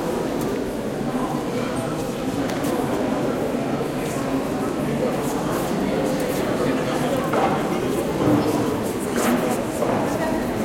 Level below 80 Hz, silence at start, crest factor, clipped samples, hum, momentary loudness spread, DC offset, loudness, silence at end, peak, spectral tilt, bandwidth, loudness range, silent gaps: -44 dBFS; 0 s; 16 dB; under 0.1%; none; 4 LU; under 0.1%; -23 LUFS; 0 s; -6 dBFS; -5.5 dB/octave; 16.5 kHz; 3 LU; none